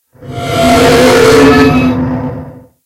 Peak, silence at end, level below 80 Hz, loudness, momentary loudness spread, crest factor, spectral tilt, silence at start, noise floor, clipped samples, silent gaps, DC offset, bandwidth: 0 dBFS; 0.25 s; -28 dBFS; -7 LUFS; 16 LU; 8 dB; -5 dB/octave; 0.2 s; -27 dBFS; 2%; none; under 0.1%; 16.5 kHz